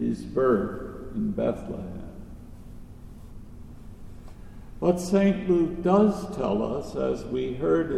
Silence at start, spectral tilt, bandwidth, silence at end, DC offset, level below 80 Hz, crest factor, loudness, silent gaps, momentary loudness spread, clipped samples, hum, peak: 0 s; -7.5 dB/octave; 13.5 kHz; 0 s; under 0.1%; -44 dBFS; 18 dB; -26 LUFS; none; 24 LU; under 0.1%; none; -10 dBFS